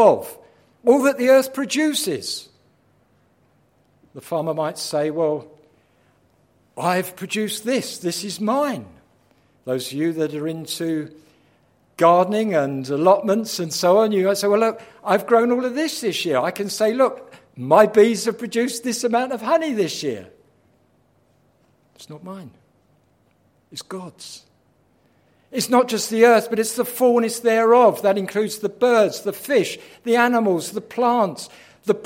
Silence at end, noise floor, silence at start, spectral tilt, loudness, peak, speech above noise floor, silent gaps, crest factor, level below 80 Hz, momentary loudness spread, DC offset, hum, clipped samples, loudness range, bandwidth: 0 s; -61 dBFS; 0 s; -4 dB/octave; -20 LUFS; 0 dBFS; 42 dB; none; 20 dB; -70 dBFS; 16 LU; under 0.1%; none; under 0.1%; 10 LU; 16.5 kHz